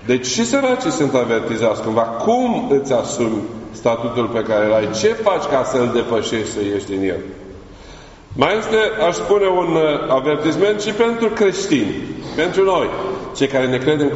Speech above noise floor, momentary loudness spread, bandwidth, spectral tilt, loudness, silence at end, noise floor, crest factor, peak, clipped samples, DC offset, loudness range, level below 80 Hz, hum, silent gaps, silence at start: 22 dB; 6 LU; 8 kHz; -4 dB/octave; -18 LUFS; 0 s; -39 dBFS; 18 dB; 0 dBFS; under 0.1%; under 0.1%; 4 LU; -46 dBFS; none; none; 0 s